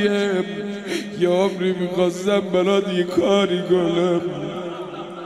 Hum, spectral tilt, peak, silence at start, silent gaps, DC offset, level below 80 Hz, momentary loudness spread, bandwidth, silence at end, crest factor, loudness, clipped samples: none; -6 dB/octave; -6 dBFS; 0 s; none; under 0.1%; -66 dBFS; 10 LU; 12.5 kHz; 0 s; 14 dB; -21 LUFS; under 0.1%